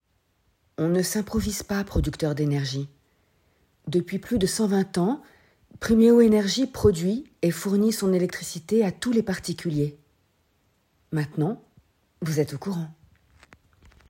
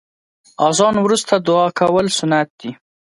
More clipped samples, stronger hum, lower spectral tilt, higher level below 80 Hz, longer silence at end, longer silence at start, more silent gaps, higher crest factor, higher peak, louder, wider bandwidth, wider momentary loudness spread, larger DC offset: neither; neither; first, -6 dB/octave vs -4 dB/octave; first, -46 dBFS vs -56 dBFS; first, 1.15 s vs 0.35 s; first, 0.8 s vs 0.6 s; second, none vs 2.50-2.58 s; about the same, 18 dB vs 16 dB; second, -6 dBFS vs 0 dBFS; second, -24 LUFS vs -16 LUFS; first, 16.5 kHz vs 11.5 kHz; first, 13 LU vs 9 LU; neither